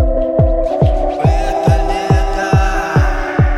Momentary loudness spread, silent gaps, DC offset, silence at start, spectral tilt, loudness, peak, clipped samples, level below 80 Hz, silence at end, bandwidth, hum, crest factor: 1 LU; none; under 0.1%; 0 s; -7 dB/octave; -14 LUFS; 0 dBFS; under 0.1%; -16 dBFS; 0 s; 12 kHz; none; 12 dB